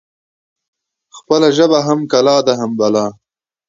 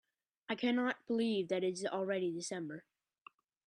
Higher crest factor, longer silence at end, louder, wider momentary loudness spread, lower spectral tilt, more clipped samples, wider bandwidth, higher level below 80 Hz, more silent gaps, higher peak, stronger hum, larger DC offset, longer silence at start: about the same, 16 dB vs 16 dB; second, 0.55 s vs 0.85 s; first, -13 LUFS vs -37 LUFS; second, 6 LU vs 11 LU; about the same, -5 dB/octave vs -4.5 dB/octave; neither; second, 7.6 kHz vs 11 kHz; first, -62 dBFS vs -84 dBFS; neither; first, 0 dBFS vs -22 dBFS; neither; neither; first, 1.15 s vs 0.5 s